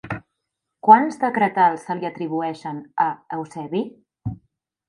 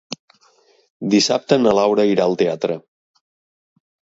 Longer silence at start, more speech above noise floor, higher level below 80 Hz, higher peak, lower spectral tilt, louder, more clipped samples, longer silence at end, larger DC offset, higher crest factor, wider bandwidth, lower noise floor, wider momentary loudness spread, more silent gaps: about the same, 0.05 s vs 0.1 s; first, 60 dB vs 40 dB; first, -56 dBFS vs -62 dBFS; about the same, 0 dBFS vs 0 dBFS; first, -7 dB/octave vs -4.5 dB/octave; second, -20 LUFS vs -17 LUFS; neither; second, 0.55 s vs 1.35 s; neither; about the same, 22 dB vs 20 dB; first, 11 kHz vs 8 kHz; first, -80 dBFS vs -56 dBFS; first, 19 LU vs 15 LU; second, none vs 0.20-0.28 s, 0.90-1.00 s